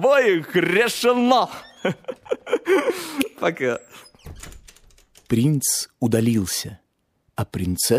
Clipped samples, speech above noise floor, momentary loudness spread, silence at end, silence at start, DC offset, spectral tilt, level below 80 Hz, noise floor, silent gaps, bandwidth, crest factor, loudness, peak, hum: under 0.1%; 47 dB; 15 LU; 0 s; 0 s; under 0.1%; -4.5 dB/octave; -52 dBFS; -68 dBFS; none; 15.5 kHz; 20 dB; -21 LUFS; -2 dBFS; none